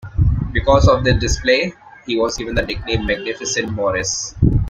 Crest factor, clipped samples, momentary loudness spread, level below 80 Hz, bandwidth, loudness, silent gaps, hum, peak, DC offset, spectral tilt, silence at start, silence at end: 16 dB; under 0.1%; 8 LU; -26 dBFS; 9.4 kHz; -18 LUFS; none; none; -2 dBFS; under 0.1%; -4.5 dB/octave; 0.05 s; 0 s